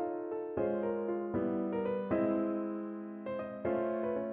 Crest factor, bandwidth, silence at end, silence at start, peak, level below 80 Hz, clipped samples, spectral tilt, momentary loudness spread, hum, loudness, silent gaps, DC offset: 16 dB; 3.8 kHz; 0 s; 0 s; -20 dBFS; -66 dBFS; under 0.1%; -11 dB/octave; 8 LU; none; -35 LUFS; none; under 0.1%